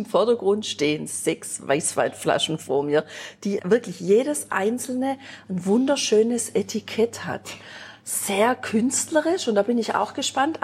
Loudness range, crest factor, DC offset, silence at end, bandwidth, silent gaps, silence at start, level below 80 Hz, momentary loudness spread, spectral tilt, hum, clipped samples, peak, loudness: 2 LU; 16 dB; under 0.1%; 0.05 s; 16 kHz; none; 0 s; -70 dBFS; 11 LU; -3.5 dB/octave; none; under 0.1%; -6 dBFS; -23 LUFS